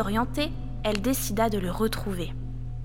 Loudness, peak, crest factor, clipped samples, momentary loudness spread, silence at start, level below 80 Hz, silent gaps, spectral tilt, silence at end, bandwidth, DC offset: -28 LUFS; -6 dBFS; 22 dB; under 0.1%; 9 LU; 0 s; -38 dBFS; none; -5 dB/octave; 0 s; 17 kHz; 1%